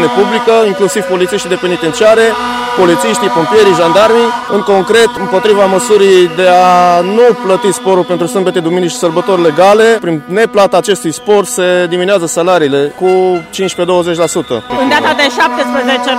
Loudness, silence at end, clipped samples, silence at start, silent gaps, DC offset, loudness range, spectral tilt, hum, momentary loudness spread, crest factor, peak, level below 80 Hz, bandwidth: -9 LUFS; 0 s; 0.6%; 0 s; none; under 0.1%; 3 LU; -4 dB/octave; none; 6 LU; 8 dB; 0 dBFS; -48 dBFS; 16 kHz